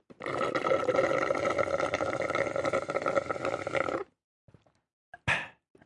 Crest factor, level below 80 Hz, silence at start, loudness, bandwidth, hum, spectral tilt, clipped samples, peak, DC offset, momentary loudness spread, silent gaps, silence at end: 20 dB; -64 dBFS; 0.2 s; -30 LUFS; 11.5 kHz; none; -5 dB/octave; under 0.1%; -12 dBFS; under 0.1%; 7 LU; 4.24-4.48 s, 4.93-5.12 s; 0.35 s